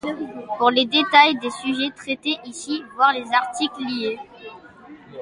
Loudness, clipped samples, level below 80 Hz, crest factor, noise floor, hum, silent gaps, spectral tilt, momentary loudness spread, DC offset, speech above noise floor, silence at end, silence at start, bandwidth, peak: -20 LUFS; under 0.1%; -66 dBFS; 20 dB; -44 dBFS; none; none; -2.5 dB/octave; 18 LU; under 0.1%; 23 dB; 0 s; 0.05 s; 11.5 kHz; 0 dBFS